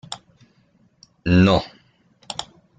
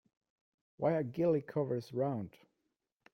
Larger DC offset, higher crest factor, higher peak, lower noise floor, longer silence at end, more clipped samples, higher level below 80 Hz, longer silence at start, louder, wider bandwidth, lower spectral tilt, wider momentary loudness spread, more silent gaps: neither; about the same, 20 dB vs 18 dB; first, -4 dBFS vs -20 dBFS; second, -60 dBFS vs -85 dBFS; second, 0.35 s vs 0.85 s; neither; first, -46 dBFS vs -74 dBFS; second, 0.1 s vs 0.8 s; first, -20 LUFS vs -35 LUFS; second, 9.2 kHz vs 16 kHz; second, -6.5 dB/octave vs -9 dB/octave; first, 21 LU vs 6 LU; neither